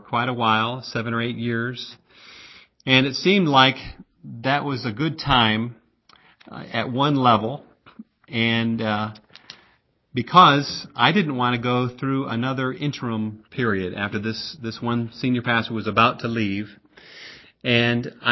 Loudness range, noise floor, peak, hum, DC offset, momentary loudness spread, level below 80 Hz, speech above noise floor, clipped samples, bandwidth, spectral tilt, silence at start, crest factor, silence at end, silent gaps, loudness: 5 LU; -62 dBFS; 0 dBFS; none; under 0.1%; 16 LU; -52 dBFS; 40 dB; under 0.1%; 6.2 kHz; -6 dB/octave; 0.1 s; 22 dB; 0 s; none; -21 LUFS